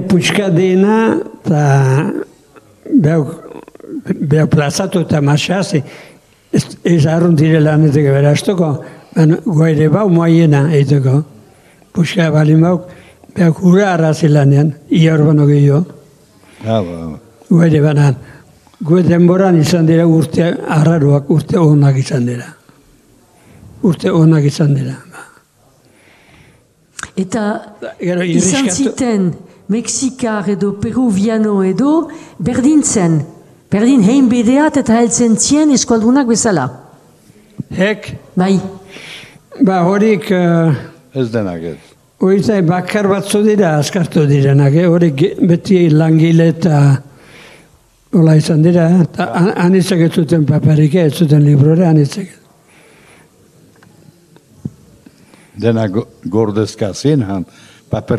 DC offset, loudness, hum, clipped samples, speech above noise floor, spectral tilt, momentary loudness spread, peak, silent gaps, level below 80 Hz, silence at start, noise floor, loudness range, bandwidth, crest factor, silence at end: under 0.1%; -12 LUFS; none; under 0.1%; 39 dB; -6.5 dB/octave; 13 LU; 0 dBFS; none; -48 dBFS; 0 s; -50 dBFS; 6 LU; 12.5 kHz; 12 dB; 0 s